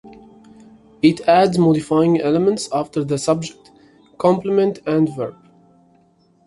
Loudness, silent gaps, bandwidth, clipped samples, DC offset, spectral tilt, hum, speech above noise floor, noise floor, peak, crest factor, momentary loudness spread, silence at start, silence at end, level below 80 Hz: -18 LUFS; none; 11.5 kHz; under 0.1%; under 0.1%; -6.5 dB/octave; none; 40 dB; -56 dBFS; -2 dBFS; 18 dB; 8 LU; 0.05 s; 1.15 s; -58 dBFS